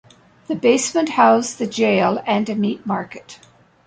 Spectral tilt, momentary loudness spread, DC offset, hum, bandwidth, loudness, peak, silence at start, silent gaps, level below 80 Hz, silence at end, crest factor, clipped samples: -4.5 dB/octave; 11 LU; under 0.1%; none; 9.6 kHz; -18 LUFS; -2 dBFS; 0.5 s; none; -62 dBFS; 0.5 s; 16 dB; under 0.1%